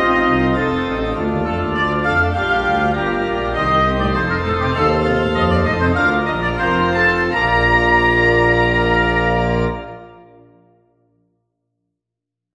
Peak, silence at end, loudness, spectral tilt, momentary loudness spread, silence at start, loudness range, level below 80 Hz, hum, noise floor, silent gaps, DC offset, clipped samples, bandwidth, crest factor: -2 dBFS; 2.4 s; -16 LUFS; -7 dB/octave; 7 LU; 0 s; 5 LU; -30 dBFS; 60 Hz at -50 dBFS; -82 dBFS; none; under 0.1%; under 0.1%; 10 kHz; 16 dB